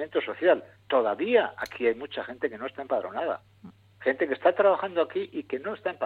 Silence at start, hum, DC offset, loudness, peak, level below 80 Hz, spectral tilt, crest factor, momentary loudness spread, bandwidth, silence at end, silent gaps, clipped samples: 0 s; none; under 0.1%; -27 LUFS; -8 dBFS; -72 dBFS; -5.5 dB/octave; 18 dB; 10 LU; 10.5 kHz; 0 s; none; under 0.1%